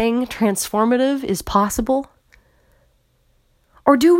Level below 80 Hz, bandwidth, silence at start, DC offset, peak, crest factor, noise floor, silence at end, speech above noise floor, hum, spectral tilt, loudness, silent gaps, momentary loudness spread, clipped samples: -42 dBFS; 16.5 kHz; 0 s; under 0.1%; 0 dBFS; 20 dB; -61 dBFS; 0 s; 44 dB; none; -4.5 dB/octave; -19 LUFS; none; 6 LU; under 0.1%